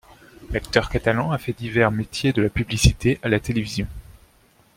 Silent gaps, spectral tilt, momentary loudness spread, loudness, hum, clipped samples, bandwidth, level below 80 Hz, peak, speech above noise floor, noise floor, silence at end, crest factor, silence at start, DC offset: none; -5.5 dB/octave; 10 LU; -22 LUFS; none; under 0.1%; 16.5 kHz; -34 dBFS; 0 dBFS; 36 dB; -57 dBFS; 0.75 s; 22 dB; 0.4 s; under 0.1%